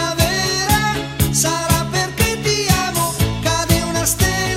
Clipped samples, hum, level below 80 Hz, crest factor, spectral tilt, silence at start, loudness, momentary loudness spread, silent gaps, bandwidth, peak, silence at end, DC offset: under 0.1%; none; -30 dBFS; 16 dB; -3.5 dB/octave; 0 s; -17 LUFS; 3 LU; none; 16.5 kHz; 0 dBFS; 0 s; under 0.1%